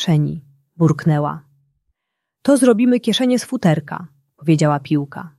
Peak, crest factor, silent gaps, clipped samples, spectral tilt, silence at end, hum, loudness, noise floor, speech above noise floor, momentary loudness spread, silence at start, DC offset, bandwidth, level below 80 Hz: -2 dBFS; 16 dB; none; under 0.1%; -6.5 dB/octave; 0.1 s; none; -17 LUFS; -79 dBFS; 63 dB; 12 LU; 0 s; under 0.1%; 12.5 kHz; -58 dBFS